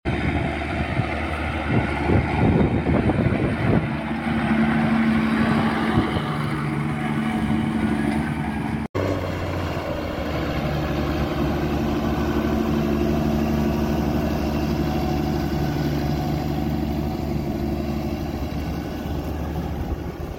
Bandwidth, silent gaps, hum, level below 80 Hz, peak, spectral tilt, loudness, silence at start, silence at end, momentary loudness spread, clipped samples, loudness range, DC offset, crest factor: 16.5 kHz; 8.89-8.94 s; none; -32 dBFS; -6 dBFS; -7.5 dB/octave; -23 LUFS; 0.05 s; 0 s; 7 LU; under 0.1%; 4 LU; under 0.1%; 16 dB